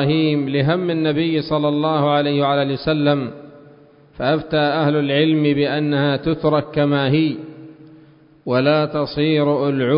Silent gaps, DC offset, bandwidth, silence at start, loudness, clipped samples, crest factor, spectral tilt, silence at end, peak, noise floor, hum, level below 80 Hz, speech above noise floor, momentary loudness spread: none; under 0.1%; 5.4 kHz; 0 s; -18 LUFS; under 0.1%; 14 dB; -12 dB/octave; 0 s; -4 dBFS; -48 dBFS; none; -50 dBFS; 31 dB; 5 LU